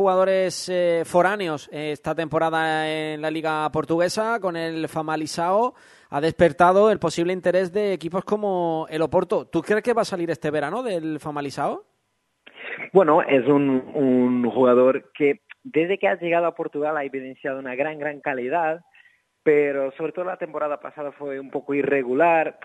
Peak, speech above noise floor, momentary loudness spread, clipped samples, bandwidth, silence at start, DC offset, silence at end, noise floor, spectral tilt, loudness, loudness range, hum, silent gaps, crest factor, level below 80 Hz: -2 dBFS; 50 dB; 11 LU; under 0.1%; 12 kHz; 0 s; under 0.1%; 0.15 s; -72 dBFS; -5.5 dB/octave; -22 LUFS; 6 LU; none; none; 20 dB; -60 dBFS